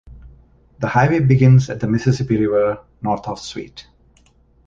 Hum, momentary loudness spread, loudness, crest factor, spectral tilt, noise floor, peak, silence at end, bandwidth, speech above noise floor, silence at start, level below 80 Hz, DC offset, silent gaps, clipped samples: none; 16 LU; -17 LUFS; 16 dB; -7.5 dB/octave; -54 dBFS; -2 dBFS; 0.85 s; 7.6 kHz; 38 dB; 0.1 s; -44 dBFS; under 0.1%; none; under 0.1%